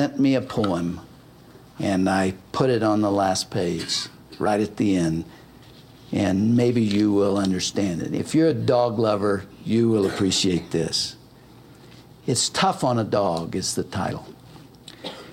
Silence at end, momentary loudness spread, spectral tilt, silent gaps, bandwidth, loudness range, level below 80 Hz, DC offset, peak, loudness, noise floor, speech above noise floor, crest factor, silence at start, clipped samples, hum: 0 s; 10 LU; -5 dB/octave; none; 16.5 kHz; 3 LU; -54 dBFS; under 0.1%; -6 dBFS; -22 LUFS; -48 dBFS; 26 dB; 16 dB; 0 s; under 0.1%; none